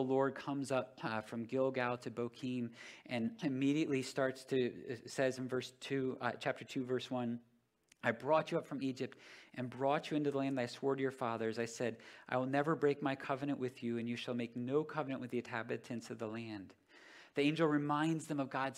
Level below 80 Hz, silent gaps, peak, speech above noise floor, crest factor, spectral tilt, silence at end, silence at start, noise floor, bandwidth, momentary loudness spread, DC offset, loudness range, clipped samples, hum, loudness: -84 dBFS; none; -18 dBFS; 35 dB; 20 dB; -6 dB/octave; 0 s; 0 s; -73 dBFS; 13.5 kHz; 10 LU; under 0.1%; 3 LU; under 0.1%; none; -38 LUFS